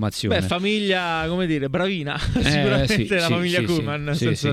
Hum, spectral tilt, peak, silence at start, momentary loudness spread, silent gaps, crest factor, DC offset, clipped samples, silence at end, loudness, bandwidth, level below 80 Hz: none; -5.5 dB/octave; -4 dBFS; 0 s; 4 LU; none; 18 dB; under 0.1%; under 0.1%; 0 s; -21 LUFS; 15 kHz; -38 dBFS